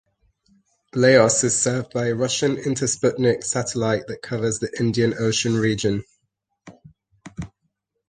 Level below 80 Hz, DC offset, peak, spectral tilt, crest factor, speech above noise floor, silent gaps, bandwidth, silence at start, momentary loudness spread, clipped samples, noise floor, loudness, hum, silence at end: -54 dBFS; under 0.1%; -2 dBFS; -4 dB/octave; 20 dB; 54 dB; none; 10 kHz; 0.95 s; 14 LU; under 0.1%; -75 dBFS; -21 LUFS; none; 0.6 s